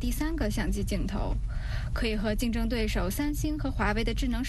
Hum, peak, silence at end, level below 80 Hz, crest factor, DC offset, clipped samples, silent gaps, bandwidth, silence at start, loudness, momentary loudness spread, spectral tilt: none; -12 dBFS; 0 s; -32 dBFS; 16 dB; under 0.1%; under 0.1%; none; 12.5 kHz; 0 s; -30 LUFS; 5 LU; -5.5 dB/octave